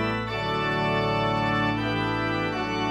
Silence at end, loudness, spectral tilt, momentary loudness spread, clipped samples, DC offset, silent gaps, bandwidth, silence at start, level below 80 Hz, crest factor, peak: 0 s; -25 LUFS; -6.5 dB/octave; 3 LU; under 0.1%; under 0.1%; none; 12 kHz; 0 s; -46 dBFS; 12 dB; -12 dBFS